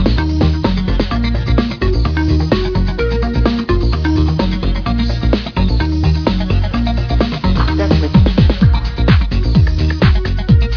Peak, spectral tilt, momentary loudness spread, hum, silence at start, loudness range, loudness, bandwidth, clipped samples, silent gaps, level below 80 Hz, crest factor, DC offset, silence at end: 0 dBFS; -8 dB/octave; 5 LU; none; 0 s; 3 LU; -15 LUFS; 5.4 kHz; under 0.1%; none; -16 dBFS; 12 dB; under 0.1%; 0 s